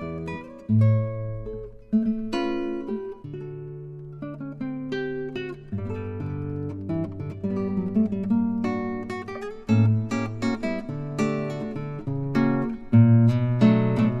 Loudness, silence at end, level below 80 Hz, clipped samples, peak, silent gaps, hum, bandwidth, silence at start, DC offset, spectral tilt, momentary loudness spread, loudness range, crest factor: -25 LUFS; 0 s; -50 dBFS; under 0.1%; -6 dBFS; none; none; 8 kHz; 0 s; under 0.1%; -8.5 dB/octave; 16 LU; 9 LU; 18 dB